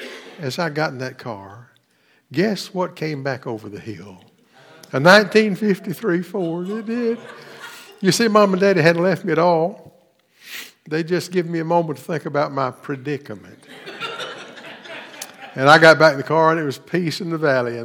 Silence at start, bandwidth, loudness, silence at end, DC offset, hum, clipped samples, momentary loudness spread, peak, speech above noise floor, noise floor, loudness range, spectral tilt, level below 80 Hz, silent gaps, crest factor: 0 s; 20 kHz; -18 LUFS; 0 s; under 0.1%; none; under 0.1%; 22 LU; 0 dBFS; 42 dB; -60 dBFS; 10 LU; -5 dB/octave; -70 dBFS; none; 20 dB